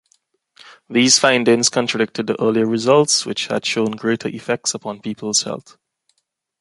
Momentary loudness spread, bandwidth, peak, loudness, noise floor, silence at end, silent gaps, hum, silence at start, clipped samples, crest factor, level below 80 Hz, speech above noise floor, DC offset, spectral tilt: 11 LU; 11.5 kHz; 0 dBFS; -17 LUFS; -71 dBFS; 1 s; none; none; 0.65 s; under 0.1%; 18 dB; -64 dBFS; 53 dB; under 0.1%; -3 dB/octave